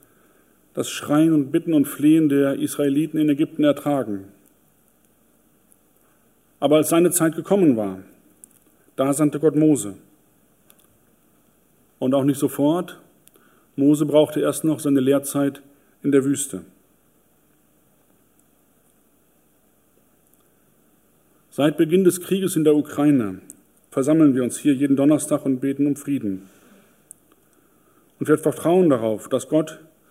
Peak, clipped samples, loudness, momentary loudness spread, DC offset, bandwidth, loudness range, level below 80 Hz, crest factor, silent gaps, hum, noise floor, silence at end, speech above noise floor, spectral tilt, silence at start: -4 dBFS; under 0.1%; -20 LUFS; 12 LU; under 0.1%; 16 kHz; 7 LU; -70 dBFS; 18 dB; none; 50 Hz at -55 dBFS; -61 dBFS; 0.35 s; 42 dB; -6 dB/octave; 0.75 s